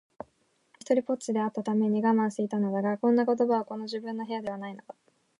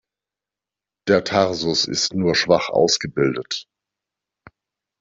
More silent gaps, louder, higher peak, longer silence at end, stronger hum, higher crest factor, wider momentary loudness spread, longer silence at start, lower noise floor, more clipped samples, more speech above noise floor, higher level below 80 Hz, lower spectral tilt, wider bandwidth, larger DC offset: neither; second, -28 LUFS vs -19 LUFS; second, -12 dBFS vs -2 dBFS; second, 0.45 s vs 1.4 s; neither; about the same, 16 dB vs 20 dB; first, 16 LU vs 10 LU; second, 0.9 s vs 1.05 s; second, -70 dBFS vs -88 dBFS; neither; second, 42 dB vs 69 dB; second, -78 dBFS vs -58 dBFS; first, -6.5 dB/octave vs -3.5 dB/octave; first, 11 kHz vs 7.8 kHz; neither